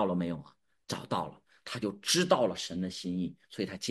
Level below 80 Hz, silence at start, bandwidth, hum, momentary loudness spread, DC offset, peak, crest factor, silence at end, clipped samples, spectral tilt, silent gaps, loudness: -68 dBFS; 0 s; 12.5 kHz; none; 14 LU; under 0.1%; -10 dBFS; 24 dB; 0 s; under 0.1%; -4 dB/octave; none; -33 LUFS